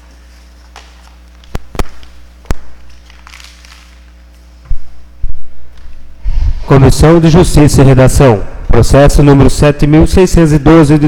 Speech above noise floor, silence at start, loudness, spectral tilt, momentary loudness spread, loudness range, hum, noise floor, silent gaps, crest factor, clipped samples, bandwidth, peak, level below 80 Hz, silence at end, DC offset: 32 dB; 1.55 s; -7 LUFS; -7 dB/octave; 22 LU; 22 LU; none; -36 dBFS; none; 8 dB; 0.6%; 16.5 kHz; 0 dBFS; -16 dBFS; 0 s; under 0.1%